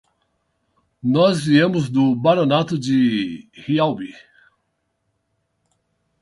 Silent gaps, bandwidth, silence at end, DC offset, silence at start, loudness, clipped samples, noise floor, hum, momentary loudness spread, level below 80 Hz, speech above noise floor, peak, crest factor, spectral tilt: none; 11.5 kHz; 2.1 s; under 0.1%; 1.05 s; -18 LUFS; under 0.1%; -72 dBFS; none; 12 LU; -60 dBFS; 54 dB; -2 dBFS; 18 dB; -6.5 dB/octave